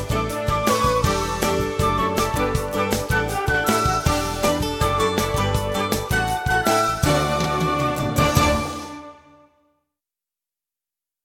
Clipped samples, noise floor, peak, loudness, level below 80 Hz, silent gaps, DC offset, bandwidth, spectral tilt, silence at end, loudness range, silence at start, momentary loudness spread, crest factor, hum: under 0.1%; -89 dBFS; -4 dBFS; -21 LUFS; -34 dBFS; none; under 0.1%; 17 kHz; -4.5 dB/octave; 2.1 s; 3 LU; 0 s; 4 LU; 18 dB; none